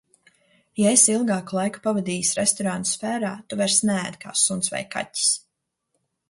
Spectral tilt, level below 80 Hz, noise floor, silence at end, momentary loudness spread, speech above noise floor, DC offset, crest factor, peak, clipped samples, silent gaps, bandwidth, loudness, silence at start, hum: -3 dB/octave; -66 dBFS; -77 dBFS; 0.9 s; 11 LU; 54 dB; under 0.1%; 22 dB; -4 dBFS; under 0.1%; none; 11.5 kHz; -21 LUFS; 0.75 s; none